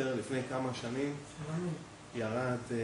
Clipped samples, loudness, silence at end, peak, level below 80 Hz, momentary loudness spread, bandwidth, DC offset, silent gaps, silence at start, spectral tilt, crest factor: under 0.1%; -37 LUFS; 0 s; -22 dBFS; -66 dBFS; 7 LU; 10.5 kHz; under 0.1%; none; 0 s; -6 dB/octave; 16 dB